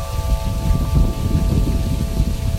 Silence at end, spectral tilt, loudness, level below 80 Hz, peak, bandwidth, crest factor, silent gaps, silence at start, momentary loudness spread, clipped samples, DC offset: 0 s; -7 dB/octave; -20 LUFS; -20 dBFS; -4 dBFS; 16 kHz; 14 dB; none; 0 s; 4 LU; under 0.1%; under 0.1%